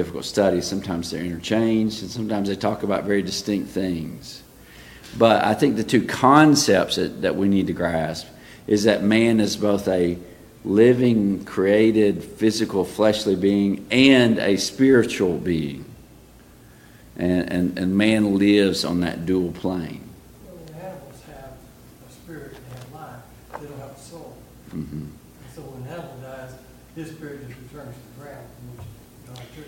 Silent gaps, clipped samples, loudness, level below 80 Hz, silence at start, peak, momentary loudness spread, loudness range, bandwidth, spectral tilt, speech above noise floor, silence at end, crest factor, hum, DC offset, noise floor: none; under 0.1%; -20 LUFS; -52 dBFS; 0 s; 0 dBFS; 24 LU; 20 LU; 17 kHz; -5.5 dB/octave; 28 dB; 0 s; 22 dB; none; under 0.1%; -48 dBFS